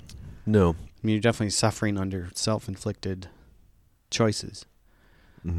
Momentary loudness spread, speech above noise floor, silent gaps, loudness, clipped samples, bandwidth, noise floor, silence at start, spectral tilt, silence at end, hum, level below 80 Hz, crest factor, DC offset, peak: 17 LU; 34 dB; none; -27 LUFS; under 0.1%; 13.5 kHz; -60 dBFS; 0.05 s; -5 dB/octave; 0 s; none; -48 dBFS; 20 dB; under 0.1%; -8 dBFS